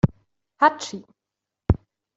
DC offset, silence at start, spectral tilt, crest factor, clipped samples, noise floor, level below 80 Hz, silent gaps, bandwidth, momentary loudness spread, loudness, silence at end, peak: under 0.1%; 0.05 s; -6 dB/octave; 22 dB; under 0.1%; -86 dBFS; -38 dBFS; none; 8 kHz; 14 LU; -24 LUFS; 0.4 s; -4 dBFS